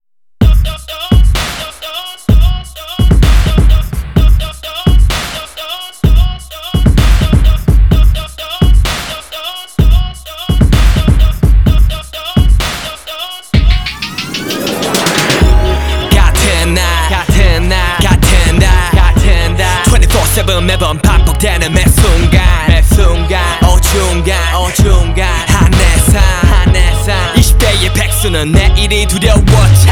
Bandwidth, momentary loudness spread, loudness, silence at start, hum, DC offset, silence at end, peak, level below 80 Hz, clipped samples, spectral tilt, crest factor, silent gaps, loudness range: 17.5 kHz; 10 LU; -10 LUFS; 0.4 s; none; 0.8%; 0 s; 0 dBFS; -10 dBFS; 0.8%; -4.5 dB/octave; 8 dB; none; 4 LU